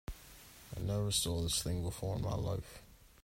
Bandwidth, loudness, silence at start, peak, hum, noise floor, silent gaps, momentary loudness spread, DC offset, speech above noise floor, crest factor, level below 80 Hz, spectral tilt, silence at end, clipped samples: 16 kHz; -37 LUFS; 0.1 s; -22 dBFS; none; -56 dBFS; none; 20 LU; under 0.1%; 20 dB; 16 dB; -52 dBFS; -4.5 dB/octave; 0.3 s; under 0.1%